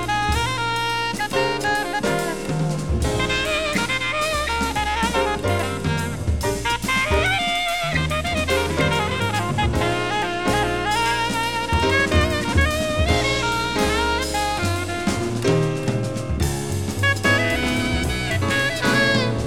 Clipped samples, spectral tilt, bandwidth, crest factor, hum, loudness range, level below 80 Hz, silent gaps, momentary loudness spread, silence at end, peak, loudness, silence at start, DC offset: under 0.1%; -4.5 dB/octave; 18.5 kHz; 16 dB; none; 2 LU; -32 dBFS; none; 5 LU; 0 s; -6 dBFS; -21 LUFS; 0 s; under 0.1%